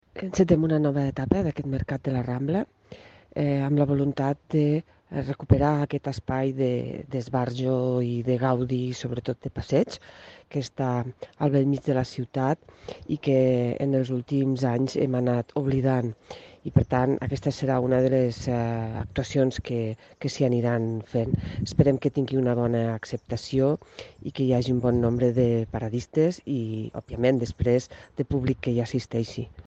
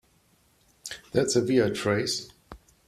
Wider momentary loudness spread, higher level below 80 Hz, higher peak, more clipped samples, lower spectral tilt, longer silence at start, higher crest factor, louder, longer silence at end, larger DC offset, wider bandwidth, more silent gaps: second, 10 LU vs 18 LU; first, -48 dBFS vs -60 dBFS; first, -4 dBFS vs -8 dBFS; neither; first, -8 dB/octave vs -4.5 dB/octave; second, 0.15 s vs 0.85 s; about the same, 22 dB vs 20 dB; about the same, -26 LUFS vs -26 LUFS; second, 0.05 s vs 0.3 s; neither; second, 8 kHz vs 14 kHz; neither